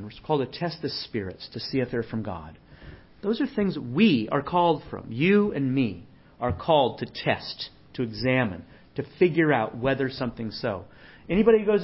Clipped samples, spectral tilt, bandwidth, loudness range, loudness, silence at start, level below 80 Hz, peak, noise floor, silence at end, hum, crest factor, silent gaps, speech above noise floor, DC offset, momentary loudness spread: under 0.1%; -10.5 dB/octave; 5.8 kHz; 6 LU; -26 LUFS; 0 s; -50 dBFS; -6 dBFS; -47 dBFS; 0 s; none; 18 dB; none; 22 dB; under 0.1%; 15 LU